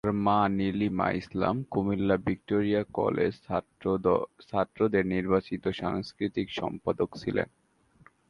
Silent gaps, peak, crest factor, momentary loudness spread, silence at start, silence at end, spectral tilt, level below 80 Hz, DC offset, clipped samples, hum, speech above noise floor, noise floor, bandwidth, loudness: none; -10 dBFS; 18 dB; 7 LU; 0.05 s; 0.85 s; -8 dB/octave; -54 dBFS; under 0.1%; under 0.1%; none; 32 dB; -61 dBFS; 10 kHz; -29 LUFS